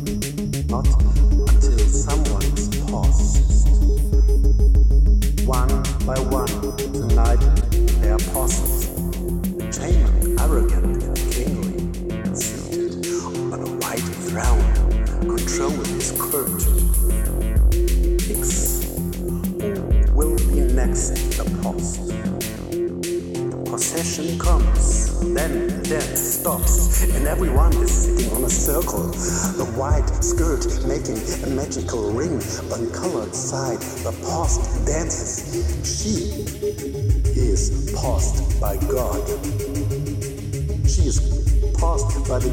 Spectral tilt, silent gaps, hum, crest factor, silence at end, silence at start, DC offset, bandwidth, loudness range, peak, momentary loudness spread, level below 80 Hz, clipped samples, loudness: -5 dB/octave; none; none; 14 dB; 0 s; 0 s; under 0.1%; 17 kHz; 5 LU; -4 dBFS; 7 LU; -20 dBFS; under 0.1%; -21 LUFS